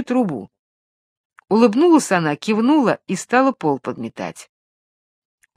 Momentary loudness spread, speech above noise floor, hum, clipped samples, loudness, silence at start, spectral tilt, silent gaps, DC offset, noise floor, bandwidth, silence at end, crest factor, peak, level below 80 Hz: 15 LU; over 73 dB; none; under 0.1%; -18 LUFS; 0 s; -5.5 dB/octave; 0.59-1.30 s; under 0.1%; under -90 dBFS; 14 kHz; 1.15 s; 18 dB; 0 dBFS; -68 dBFS